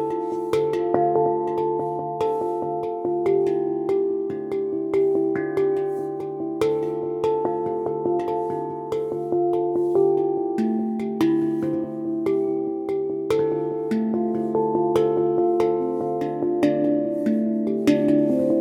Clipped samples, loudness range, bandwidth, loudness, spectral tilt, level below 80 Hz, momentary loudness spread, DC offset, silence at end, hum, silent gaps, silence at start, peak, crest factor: under 0.1%; 3 LU; 11.5 kHz; -23 LUFS; -8 dB/octave; -66 dBFS; 6 LU; under 0.1%; 0 s; none; none; 0 s; -4 dBFS; 18 dB